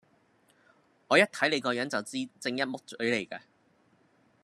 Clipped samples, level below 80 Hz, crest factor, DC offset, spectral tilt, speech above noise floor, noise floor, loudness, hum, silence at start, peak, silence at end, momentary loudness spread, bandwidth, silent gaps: under 0.1%; -80 dBFS; 24 dB; under 0.1%; -3.5 dB/octave; 37 dB; -67 dBFS; -29 LUFS; none; 1.1 s; -8 dBFS; 1.05 s; 12 LU; 13.5 kHz; none